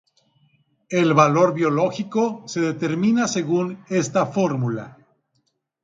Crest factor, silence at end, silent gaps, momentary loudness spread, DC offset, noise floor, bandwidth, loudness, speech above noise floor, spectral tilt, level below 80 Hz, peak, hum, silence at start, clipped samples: 20 dB; 0.95 s; none; 9 LU; under 0.1%; -71 dBFS; 9.4 kHz; -21 LUFS; 51 dB; -6 dB/octave; -66 dBFS; -2 dBFS; none; 0.9 s; under 0.1%